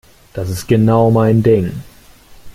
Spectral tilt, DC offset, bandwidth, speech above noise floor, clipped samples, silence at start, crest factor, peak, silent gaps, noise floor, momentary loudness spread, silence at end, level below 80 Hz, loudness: -8 dB/octave; under 0.1%; 15.5 kHz; 29 dB; under 0.1%; 0.35 s; 12 dB; -2 dBFS; none; -42 dBFS; 16 LU; 0 s; -42 dBFS; -13 LUFS